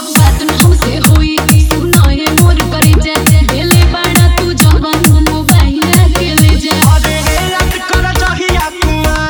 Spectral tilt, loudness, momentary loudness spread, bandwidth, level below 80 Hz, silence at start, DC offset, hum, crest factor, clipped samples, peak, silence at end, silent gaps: -4.5 dB/octave; -9 LUFS; 4 LU; over 20 kHz; -14 dBFS; 0 s; under 0.1%; none; 8 dB; 1%; 0 dBFS; 0 s; none